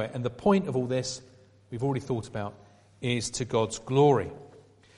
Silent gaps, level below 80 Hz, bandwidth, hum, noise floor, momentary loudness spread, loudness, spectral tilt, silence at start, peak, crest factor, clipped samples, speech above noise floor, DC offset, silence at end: none; -58 dBFS; 11.5 kHz; none; -55 dBFS; 16 LU; -28 LUFS; -5.5 dB/octave; 0 s; -10 dBFS; 20 dB; under 0.1%; 27 dB; under 0.1%; 0.4 s